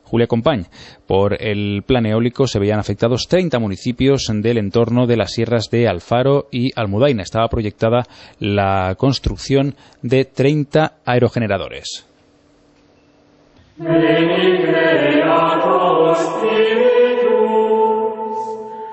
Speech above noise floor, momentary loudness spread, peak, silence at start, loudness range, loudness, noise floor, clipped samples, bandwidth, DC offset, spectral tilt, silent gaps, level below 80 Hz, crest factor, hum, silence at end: 36 dB; 8 LU; -2 dBFS; 0.1 s; 5 LU; -16 LUFS; -53 dBFS; under 0.1%; 8.4 kHz; under 0.1%; -6.5 dB/octave; none; -40 dBFS; 14 dB; none; 0 s